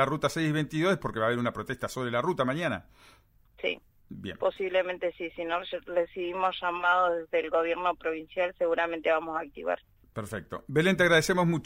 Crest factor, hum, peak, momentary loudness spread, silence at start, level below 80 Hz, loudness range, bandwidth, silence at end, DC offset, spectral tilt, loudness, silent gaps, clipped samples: 18 dB; none; -10 dBFS; 12 LU; 0 s; -58 dBFS; 5 LU; 16 kHz; 0 s; under 0.1%; -5.5 dB/octave; -29 LUFS; none; under 0.1%